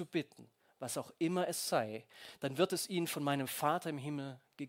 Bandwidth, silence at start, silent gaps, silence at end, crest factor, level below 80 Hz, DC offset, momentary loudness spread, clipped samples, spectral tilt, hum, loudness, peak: 16.5 kHz; 0 s; none; 0 s; 22 dB; -82 dBFS; under 0.1%; 13 LU; under 0.1%; -4.5 dB/octave; none; -37 LUFS; -16 dBFS